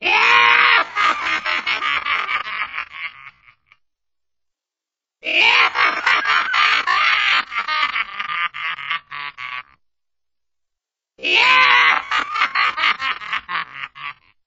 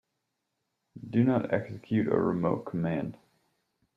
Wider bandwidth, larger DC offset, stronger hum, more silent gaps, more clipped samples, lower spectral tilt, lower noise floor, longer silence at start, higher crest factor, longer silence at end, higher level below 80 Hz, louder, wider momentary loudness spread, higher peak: first, 8 kHz vs 5.4 kHz; neither; neither; neither; neither; second, 4 dB/octave vs -10 dB/octave; first, -88 dBFS vs -82 dBFS; second, 0 s vs 0.95 s; about the same, 20 dB vs 20 dB; second, 0.35 s vs 0.8 s; about the same, -62 dBFS vs -66 dBFS; first, -16 LUFS vs -29 LUFS; first, 18 LU vs 8 LU; first, 0 dBFS vs -12 dBFS